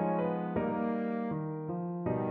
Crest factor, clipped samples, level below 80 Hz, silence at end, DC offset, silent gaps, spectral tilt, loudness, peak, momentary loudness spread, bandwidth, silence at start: 14 dB; under 0.1%; -64 dBFS; 0 s; under 0.1%; none; -8.5 dB/octave; -34 LUFS; -20 dBFS; 5 LU; 4.2 kHz; 0 s